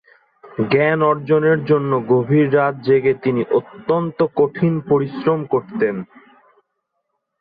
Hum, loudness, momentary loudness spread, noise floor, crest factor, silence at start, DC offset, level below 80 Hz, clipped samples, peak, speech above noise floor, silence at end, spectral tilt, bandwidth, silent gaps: none; -18 LUFS; 6 LU; -74 dBFS; 14 dB; 0.45 s; under 0.1%; -60 dBFS; under 0.1%; -4 dBFS; 57 dB; 1.35 s; -11 dB/octave; 5 kHz; none